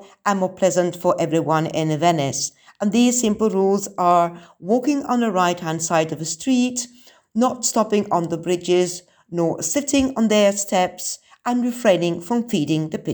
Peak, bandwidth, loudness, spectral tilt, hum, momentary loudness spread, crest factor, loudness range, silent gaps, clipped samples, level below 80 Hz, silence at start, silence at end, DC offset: -4 dBFS; over 20 kHz; -20 LUFS; -4.5 dB/octave; none; 8 LU; 16 dB; 2 LU; none; under 0.1%; -58 dBFS; 0 s; 0 s; under 0.1%